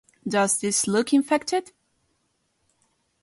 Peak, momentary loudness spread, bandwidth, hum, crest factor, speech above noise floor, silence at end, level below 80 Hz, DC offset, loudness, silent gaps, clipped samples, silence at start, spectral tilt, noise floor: -8 dBFS; 6 LU; 11.5 kHz; none; 18 dB; 49 dB; 1.6 s; -68 dBFS; under 0.1%; -23 LUFS; none; under 0.1%; 0.25 s; -3.5 dB/octave; -72 dBFS